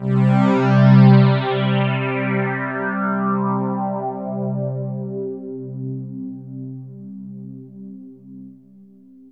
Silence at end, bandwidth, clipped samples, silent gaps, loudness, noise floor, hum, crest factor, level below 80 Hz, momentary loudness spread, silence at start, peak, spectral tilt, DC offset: 0.8 s; 5.4 kHz; under 0.1%; none; -18 LUFS; -47 dBFS; none; 16 dB; -66 dBFS; 24 LU; 0 s; -2 dBFS; -9.5 dB/octave; under 0.1%